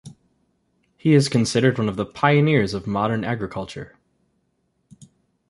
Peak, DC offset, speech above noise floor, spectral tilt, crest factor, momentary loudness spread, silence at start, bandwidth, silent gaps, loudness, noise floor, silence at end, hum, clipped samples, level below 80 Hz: -2 dBFS; under 0.1%; 50 dB; -6 dB/octave; 20 dB; 14 LU; 0.05 s; 11.5 kHz; none; -20 LUFS; -70 dBFS; 1.65 s; none; under 0.1%; -52 dBFS